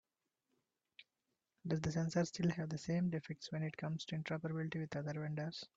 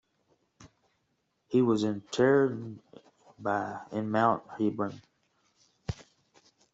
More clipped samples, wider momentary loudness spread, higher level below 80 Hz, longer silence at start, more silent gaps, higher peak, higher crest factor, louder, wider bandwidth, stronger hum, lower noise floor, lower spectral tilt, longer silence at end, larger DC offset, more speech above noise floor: neither; second, 6 LU vs 17 LU; second, -72 dBFS vs -64 dBFS; first, 1 s vs 0.6 s; neither; second, -22 dBFS vs -12 dBFS; about the same, 18 dB vs 20 dB; second, -41 LUFS vs -29 LUFS; about the same, 7.8 kHz vs 8 kHz; neither; first, -89 dBFS vs -77 dBFS; about the same, -6.5 dB/octave vs -6.5 dB/octave; second, 0.1 s vs 0.7 s; neither; about the same, 49 dB vs 49 dB